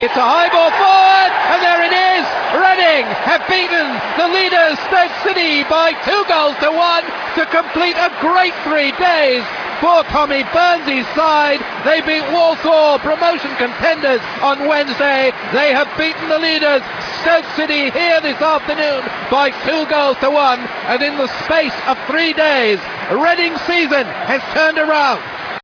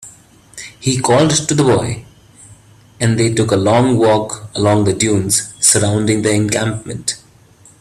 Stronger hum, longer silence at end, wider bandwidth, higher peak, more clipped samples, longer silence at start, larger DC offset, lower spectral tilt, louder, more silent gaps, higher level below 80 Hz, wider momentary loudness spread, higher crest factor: neither; second, 0 s vs 0.65 s; second, 5.4 kHz vs 15 kHz; about the same, 0 dBFS vs 0 dBFS; neither; about the same, 0 s vs 0 s; neither; about the same, -4 dB/octave vs -4.5 dB/octave; about the same, -14 LUFS vs -14 LUFS; neither; about the same, -48 dBFS vs -46 dBFS; second, 6 LU vs 11 LU; about the same, 14 dB vs 16 dB